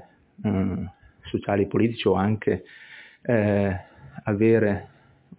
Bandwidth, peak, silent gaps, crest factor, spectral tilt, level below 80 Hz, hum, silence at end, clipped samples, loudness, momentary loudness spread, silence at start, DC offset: 4 kHz; -8 dBFS; none; 18 dB; -11.5 dB/octave; -48 dBFS; none; 0.5 s; under 0.1%; -24 LUFS; 16 LU; 0.4 s; under 0.1%